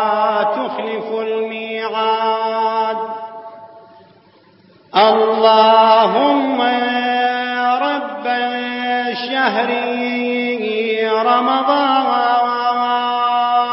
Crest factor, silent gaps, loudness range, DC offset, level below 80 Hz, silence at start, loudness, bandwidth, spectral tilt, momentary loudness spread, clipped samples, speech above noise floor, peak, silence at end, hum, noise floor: 16 dB; none; 7 LU; under 0.1%; -78 dBFS; 0 s; -16 LUFS; 5.8 kHz; -8 dB/octave; 10 LU; under 0.1%; 36 dB; 0 dBFS; 0 s; none; -49 dBFS